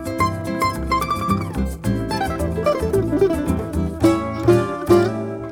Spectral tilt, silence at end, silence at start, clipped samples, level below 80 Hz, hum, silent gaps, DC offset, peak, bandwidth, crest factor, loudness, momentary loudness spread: -7 dB/octave; 0 s; 0 s; under 0.1%; -34 dBFS; none; none; under 0.1%; -2 dBFS; 19 kHz; 16 dB; -20 LUFS; 6 LU